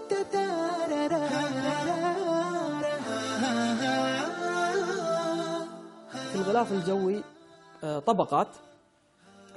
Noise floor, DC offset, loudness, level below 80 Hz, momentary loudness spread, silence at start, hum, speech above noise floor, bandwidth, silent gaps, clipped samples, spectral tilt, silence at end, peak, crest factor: -63 dBFS; under 0.1%; -29 LUFS; -72 dBFS; 8 LU; 0 s; none; 35 dB; 11.5 kHz; none; under 0.1%; -4.5 dB/octave; 0 s; -10 dBFS; 20 dB